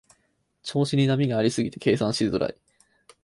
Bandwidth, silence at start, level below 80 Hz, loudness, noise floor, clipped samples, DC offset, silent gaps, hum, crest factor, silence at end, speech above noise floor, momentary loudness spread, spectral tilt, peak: 11.5 kHz; 0.65 s; -58 dBFS; -24 LUFS; -71 dBFS; under 0.1%; under 0.1%; none; none; 16 dB; 0.7 s; 47 dB; 8 LU; -6 dB/octave; -8 dBFS